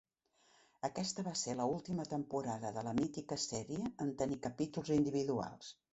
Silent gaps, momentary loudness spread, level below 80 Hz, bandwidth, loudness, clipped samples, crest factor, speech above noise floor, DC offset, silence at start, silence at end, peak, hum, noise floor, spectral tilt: none; 6 LU; -68 dBFS; 8.2 kHz; -39 LUFS; under 0.1%; 18 dB; 35 dB; under 0.1%; 0.85 s; 0.2 s; -22 dBFS; none; -74 dBFS; -5 dB/octave